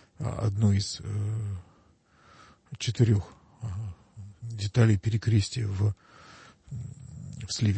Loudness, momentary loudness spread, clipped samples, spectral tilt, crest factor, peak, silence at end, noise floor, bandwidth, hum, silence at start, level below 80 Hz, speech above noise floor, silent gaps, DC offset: -28 LUFS; 19 LU; under 0.1%; -6 dB/octave; 20 dB; -8 dBFS; 0 s; -62 dBFS; 8.8 kHz; none; 0.2 s; -54 dBFS; 35 dB; none; under 0.1%